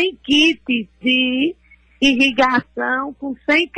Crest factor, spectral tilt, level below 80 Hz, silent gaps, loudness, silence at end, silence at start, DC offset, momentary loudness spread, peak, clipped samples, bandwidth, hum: 14 dB; -3 dB/octave; -52 dBFS; none; -17 LUFS; 0 s; 0 s; under 0.1%; 9 LU; -4 dBFS; under 0.1%; 9.8 kHz; none